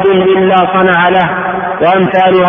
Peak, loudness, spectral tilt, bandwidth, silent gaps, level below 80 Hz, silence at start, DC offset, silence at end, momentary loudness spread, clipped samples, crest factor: 0 dBFS; -9 LUFS; -8.5 dB/octave; 3.7 kHz; none; -44 dBFS; 0 s; under 0.1%; 0 s; 5 LU; under 0.1%; 8 dB